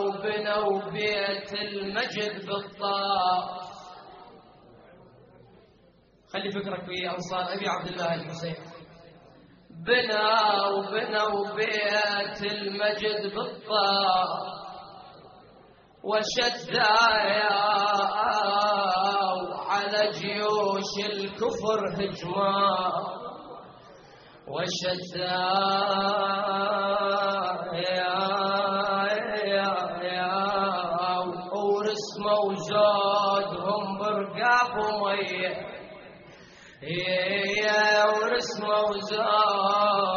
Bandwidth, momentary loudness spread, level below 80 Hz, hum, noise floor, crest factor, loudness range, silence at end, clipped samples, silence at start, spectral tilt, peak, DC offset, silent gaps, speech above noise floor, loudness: 7 kHz; 12 LU; -64 dBFS; none; -59 dBFS; 18 dB; 8 LU; 0 s; under 0.1%; 0 s; -1 dB/octave; -8 dBFS; under 0.1%; none; 33 dB; -26 LUFS